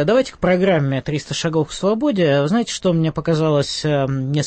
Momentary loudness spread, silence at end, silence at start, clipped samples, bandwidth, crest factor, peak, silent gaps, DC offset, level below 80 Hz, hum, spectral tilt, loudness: 5 LU; 0 s; 0 s; under 0.1%; 8.8 kHz; 12 dB; -4 dBFS; none; under 0.1%; -46 dBFS; none; -6 dB/octave; -18 LUFS